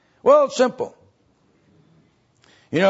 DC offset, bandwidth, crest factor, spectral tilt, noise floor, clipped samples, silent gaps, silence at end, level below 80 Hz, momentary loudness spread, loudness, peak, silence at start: under 0.1%; 8 kHz; 18 dB; -5 dB/octave; -61 dBFS; under 0.1%; none; 0 s; -70 dBFS; 16 LU; -19 LUFS; -4 dBFS; 0.25 s